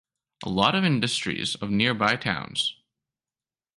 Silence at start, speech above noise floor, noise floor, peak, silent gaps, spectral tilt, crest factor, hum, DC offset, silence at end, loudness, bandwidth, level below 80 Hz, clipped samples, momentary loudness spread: 0.4 s; over 65 dB; under -90 dBFS; -6 dBFS; none; -4.5 dB/octave; 22 dB; none; under 0.1%; 1.05 s; -24 LUFS; 11.5 kHz; -58 dBFS; under 0.1%; 7 LU